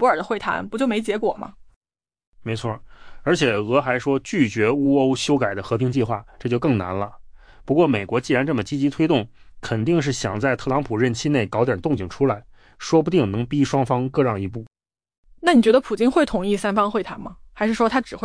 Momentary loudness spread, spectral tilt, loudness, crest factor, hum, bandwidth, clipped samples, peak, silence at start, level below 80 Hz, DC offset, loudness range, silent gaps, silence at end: 11 LU; -6 dB/octave; -21 LUFS; 16 dB; none; 10.5 kHz; under 0.1%; -6 dBFS; 0 s; -48 dBFS; under 0.1%; 3 LU; 1.76-1.81 s, 2.27-2.32 s, 15.18-15.23 s; 0 s